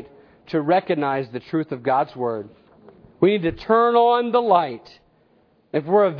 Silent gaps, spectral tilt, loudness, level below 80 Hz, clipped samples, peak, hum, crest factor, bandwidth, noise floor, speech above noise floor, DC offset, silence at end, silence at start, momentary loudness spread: none; -9 dB/octave; -21 LUFS; -56 dBFS; under 0.1%; -2 dBFS; none; 18 dB; 5.4 kHz; -59 dBFS; 40 dB; under 0.1%; 0 s; 0 s; 11 LU